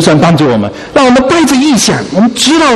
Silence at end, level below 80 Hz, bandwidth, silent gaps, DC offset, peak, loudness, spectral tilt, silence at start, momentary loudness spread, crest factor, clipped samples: 0 s; -36 dBFS; 14 kHz; none; under 0.1%; 0 dBFS; -8 LUFS; -4.5 dB/octave; 0 s; 4 LU; 8 dB; 0.4%